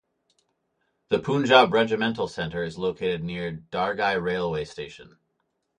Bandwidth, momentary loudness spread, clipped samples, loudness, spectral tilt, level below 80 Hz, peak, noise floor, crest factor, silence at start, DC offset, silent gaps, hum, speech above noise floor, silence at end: 10 kHz; 14 LU; under 0.1%; -24 LUFS; -5.5 dB/octave; -56 dBFS; -4 dBFS; -76 dBFS; 22 dB; 1.1 s; under 0.1%; none; none; 51 dB; 0.75 s